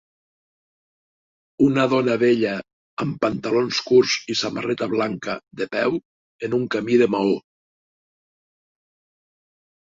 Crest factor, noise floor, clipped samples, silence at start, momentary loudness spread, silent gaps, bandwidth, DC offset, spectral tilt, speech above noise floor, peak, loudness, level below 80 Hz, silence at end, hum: 18 dB; under -90 dBFS; under 0.1%; 1.6 s; 11 LU; 2.73-2.97 s, 6.05-6.39 s; 7.8 kHz; under 0.1%; -5 dB/octave; over 70 dB; -4 dBFS; -21 LUFS; -62 dBFS; 2.5 s; none